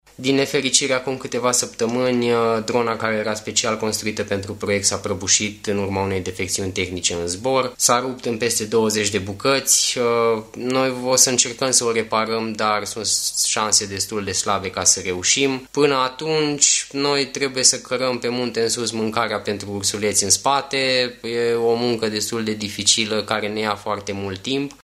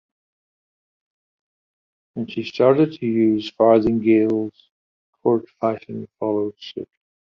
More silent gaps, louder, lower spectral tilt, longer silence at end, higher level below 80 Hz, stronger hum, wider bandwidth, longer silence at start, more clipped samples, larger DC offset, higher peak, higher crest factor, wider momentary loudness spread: second, none vs 4.71-5.13 s; about the same, -19 LUFS vs -20 LUFS; second, -2 dB/octave vs -8.5 dB/octave; second, 0.1 s vs 0.55 s; about the same, -56 dBFS vs -56 dBFS; neither; first, 15.5 kHz vs 6.4 kHz; second, 0.2 s vs 2.15 s; neither; neither; about the same, 0 dBFS vs -2 dBFS; about the same, 20 dB vs 20 dB; second, 8 LU vs 18 LU